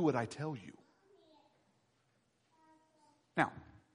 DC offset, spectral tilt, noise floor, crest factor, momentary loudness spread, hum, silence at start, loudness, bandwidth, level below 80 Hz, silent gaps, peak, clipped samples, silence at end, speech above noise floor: under 0.1%; -6.5 dB/octave; -77 dBFS; 28 dB; 20 LU; none; 0 s; -39 LUFS; 10 kHz; -76 dBFS; none; -14 dBFS; under 0.1%; 0.35 s; 40 dB